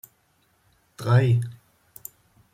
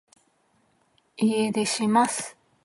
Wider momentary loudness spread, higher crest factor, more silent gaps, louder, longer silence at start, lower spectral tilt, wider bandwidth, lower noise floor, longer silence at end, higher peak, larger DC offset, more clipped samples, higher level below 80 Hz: first, 22 LU vs 9 LU; about the same, 18 dB vs 18 dB; neither; about the same, -23 LUFS vs -24 LUFS; second, 1 s vs 1.2 s; first, -7.5 dB/octave vs -4 dB/octave; first, 16.5 kHz vs 11.5 kHz; about the same, -66 dBFS vs -67 dBFS; first, 1 s vs 0.35 s; about the same, -8 dBFS vs -8 dBFS; neither; neither; first, -60 dBFS vs -76 dBFS